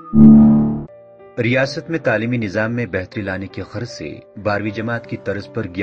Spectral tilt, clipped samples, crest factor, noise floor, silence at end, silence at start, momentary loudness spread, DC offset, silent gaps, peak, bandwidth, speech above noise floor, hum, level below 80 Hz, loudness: -8 dB/octave; under 0.1%; 16 dB; -42 dBFS; 0 s; 0 s; 19 LU; under 0.1%; none; 0 dBFS; 6.8 kHz; 26 dB; none; -40 dBFS; -17 LUFS